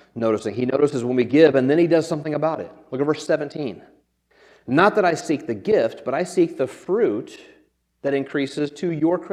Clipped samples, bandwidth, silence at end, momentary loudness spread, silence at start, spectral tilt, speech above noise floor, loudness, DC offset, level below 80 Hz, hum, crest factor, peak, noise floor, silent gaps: under 0.1%; 11.5 kHz; 0 s; 13 LU; 0.15 s; -6.5 dB/octave; 40 dB; -21 LUFS; under 0.1%; -66 dBFS; none; 20 dB; -2 dBFS; -60 dBFS; none